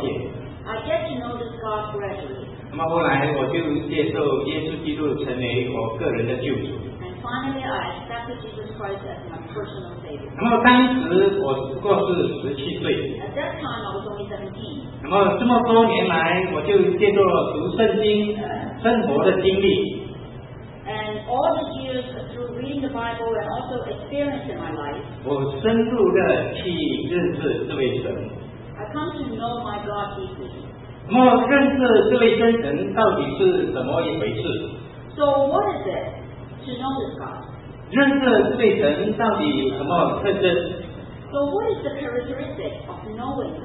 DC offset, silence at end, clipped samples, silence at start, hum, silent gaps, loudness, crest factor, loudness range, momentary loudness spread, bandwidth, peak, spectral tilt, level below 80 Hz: under 0.1%; 0 s; under 0.1%; 0 s; none; none; -22 LUFS; 22 dB; 9 LU; 17 LU; 4.1 kHz; 0 dBFS; -11 dB/octave; -48 dBFS